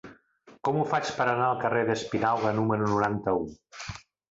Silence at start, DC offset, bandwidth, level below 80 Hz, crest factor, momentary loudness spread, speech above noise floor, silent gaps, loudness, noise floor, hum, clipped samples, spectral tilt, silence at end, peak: 0.05 s; under 0.1%; 8 kHz; -58 dBFS; 18 dB; 14 LU; 30 dB; none; -27 LUFS; -57 dBFS; none; under 0.1%; -6 dB/octave; 0.35 s; -10 dBFS